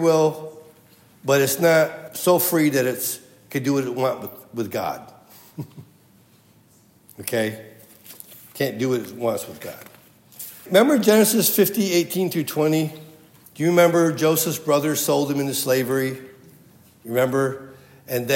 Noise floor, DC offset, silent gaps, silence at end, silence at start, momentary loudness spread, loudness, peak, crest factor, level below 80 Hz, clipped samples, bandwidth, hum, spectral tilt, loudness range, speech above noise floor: -55 dBFS; under 0.1%; none; 0 s; 0 s; 20 LU; -21 LUFS; -2 dBFS; 20 dB; -72 dBFS; under 0.1%; 16.5 kHz; none; -4.5 dB/octave; 12 LU; 35 dB